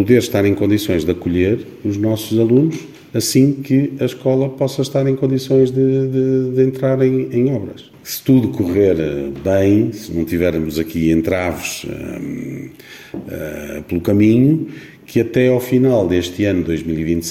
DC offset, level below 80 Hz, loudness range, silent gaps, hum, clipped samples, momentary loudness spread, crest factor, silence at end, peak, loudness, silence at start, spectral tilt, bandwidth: under 0.1%; -42 dBFS; 4 LU; none; none; under 0.1%; 13 LU; 16 dB; 0 s; 0 dBFS; -17 LUFS; 0 s; -6.5 dB/octave; 16.5 kHz